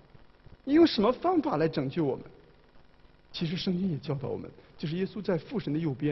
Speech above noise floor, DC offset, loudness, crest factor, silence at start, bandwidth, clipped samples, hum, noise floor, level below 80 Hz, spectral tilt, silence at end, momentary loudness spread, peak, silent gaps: 29 dB; under 0.1%; -29 LUFS; 18 dB; 0.65 s; 6 kHz; under 0.1%; none; -57 dBFS; -58 dBFS; -8 dB/octave; 0 s; 16 LU; -12 dBFS; none